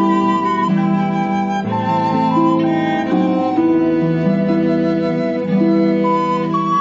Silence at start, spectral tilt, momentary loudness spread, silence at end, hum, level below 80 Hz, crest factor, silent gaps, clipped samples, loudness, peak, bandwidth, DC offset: 0 s; -8.5 dB/octave; 3 LU; 0 s; none; -52 dBFS; 12 dB; none; under 0.1%; -16 LUFS; -4 dBFS; 7.6 kHz; under 0.1%